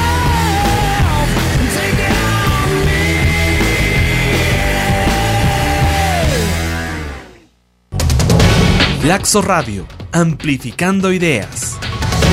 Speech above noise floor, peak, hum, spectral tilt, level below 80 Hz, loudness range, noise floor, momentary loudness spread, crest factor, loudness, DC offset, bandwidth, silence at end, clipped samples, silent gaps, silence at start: 38 dB; 0 dBFS; none; -4.5 dB/octave; -22 dBFS; 2 LU; -53 dBFS; 8 LU; 14 dB; -14 LUFS; under 0.1%; 16.5 kHz; 0 s; under 0.1%; none; 0 s